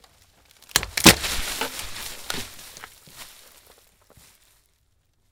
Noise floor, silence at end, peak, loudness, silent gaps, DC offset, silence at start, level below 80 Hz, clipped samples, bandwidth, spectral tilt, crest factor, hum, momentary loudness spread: -66 dBFS; 2.05 s; 0 dBFS; -21 LUFS; none; under 0.1%; 0.75 s; -44 dBFS; under 0.1%; 18 kHz; -2 dB/octave; 26 dB; none; 28 LU